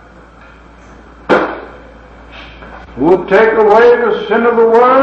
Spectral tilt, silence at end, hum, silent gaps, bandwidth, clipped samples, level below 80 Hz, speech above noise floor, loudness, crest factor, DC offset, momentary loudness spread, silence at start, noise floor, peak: -6.5 dB/octave; 0 s; none; none; 6.8 kHz; under 0.1%; -40 dBFS; 30 dB; -10 LUFS; 12 dB; under 0.1%; 24 LU; 1.3 s; -38 dBFS; 0 dBFS